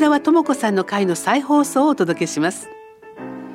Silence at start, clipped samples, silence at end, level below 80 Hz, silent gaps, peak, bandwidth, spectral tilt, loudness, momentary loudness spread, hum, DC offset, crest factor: 0 s; under 0.1%; 0 s; -66 dBFS; none; -4 dBFS; 15.5 kHz; -4.5 dB/octave; -18 LUFS; 18 LU; none; under 0.1%; 14 dB